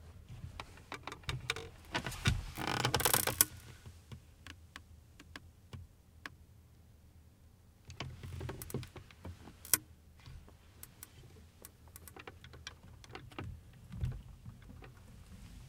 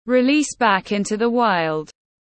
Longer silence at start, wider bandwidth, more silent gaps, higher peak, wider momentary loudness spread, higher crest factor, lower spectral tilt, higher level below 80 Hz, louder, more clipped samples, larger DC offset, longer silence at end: about the same, 0 s vs 0.05 s; first, 18 kHz vs 8.8 kHz; neither; about the same, -2 dBFS vs -4 dBFS; first, 24 LU vs 7 LU; first, 40 dB vs 16 dB; second, -2.5 dB/octave vs -4 dB/octave; about the same, -54 dBFS vs -58 dBFS; second, -36 LUFS vs -19 LUFS; neither; neither; second, 0 s vs 0.35 s